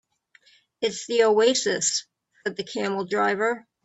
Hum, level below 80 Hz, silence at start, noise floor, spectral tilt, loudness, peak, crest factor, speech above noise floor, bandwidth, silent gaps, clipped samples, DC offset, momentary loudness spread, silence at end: none; -72 dBFS; 0.8 s; -60 dBFS; -2 dB/octave; -24 LUFS; -8 dBFS; 18 dB; 37 dB; 8.4 kHz; none; under 0.1%; under 0.1%; 11 LU; 0.25 s